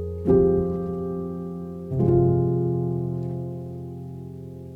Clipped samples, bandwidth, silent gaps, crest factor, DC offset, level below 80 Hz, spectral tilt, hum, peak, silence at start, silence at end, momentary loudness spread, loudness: under 0.1%; 2.3 kHz; none; 16 dB; under 0.1%; -44 dBFS; -12 dB/octave; none; -8 dBFS; 0 s; 0 s; 17 LU; -24 LUFS